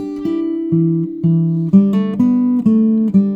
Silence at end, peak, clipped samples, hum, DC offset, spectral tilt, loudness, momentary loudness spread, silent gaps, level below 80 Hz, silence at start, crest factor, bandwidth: 0 s; 0 dBFS; under 0.1%; none; under 0.1%; -11 dB/octave; -15 LUFS; 7 LU; none; -54 dBFS; 0 s; 14 dB; 4.6 kHz